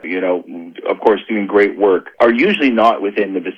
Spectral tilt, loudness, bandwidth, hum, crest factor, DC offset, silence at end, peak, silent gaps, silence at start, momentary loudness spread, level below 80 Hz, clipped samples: -6.5 dB/octave; -15 LUFS; 8.4 kHz; none; 14 dB; under 0.1%; 0.05 s; 0 dBFS; none; 0.05 s; 10 LU; -58 dBFS; under 0.1%